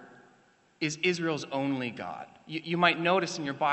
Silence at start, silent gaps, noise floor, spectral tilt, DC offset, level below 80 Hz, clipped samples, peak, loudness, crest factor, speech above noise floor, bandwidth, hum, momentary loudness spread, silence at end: 0 s; none; -64 dBFS; -4.5 dB/octave; under 0.1%; -76 dBFS; under 0.1%; -6 dBFS; -29 LUFS; 24 dB; 34 dB; 8.2 kHz; none; 14 LU; 0 s